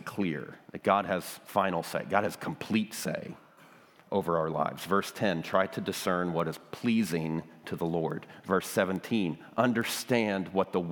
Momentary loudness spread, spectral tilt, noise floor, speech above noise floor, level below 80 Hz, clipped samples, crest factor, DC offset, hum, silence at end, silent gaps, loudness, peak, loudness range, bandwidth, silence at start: 8 LU; -5 dB/octave; -57 dBFS; 26 dB; -72 dBFS; under 0.1%; 22 dB; under 0.1%; none; 0 s; none; -31 LUFS; -8 dBFS; 2 LU; 19.5 kHz; 0 s